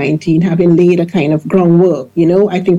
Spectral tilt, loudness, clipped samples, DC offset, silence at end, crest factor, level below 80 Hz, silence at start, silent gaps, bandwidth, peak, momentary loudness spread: -9 dB/octave; -11 LUFS; under 0.1%; under 0.1%; 0 s; 10 dB; -50 dBFS; 0 s; none; 7.6 kHz; 0 dBFS; 4 LU